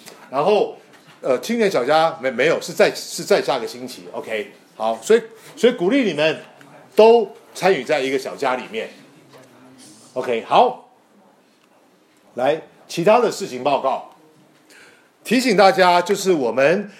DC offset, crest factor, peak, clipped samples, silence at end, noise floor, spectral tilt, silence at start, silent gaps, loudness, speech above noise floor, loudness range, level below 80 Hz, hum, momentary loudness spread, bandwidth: under 0.1%; 18 dB; -2 dBFS; under 0.1%; 0.1 s; -55 dBFS; -4 dB/octave; 0.05 s; none; -18 LUFS; 37 dB; 5 LU; -76 dBFS; none; 16 LU; 16 kHz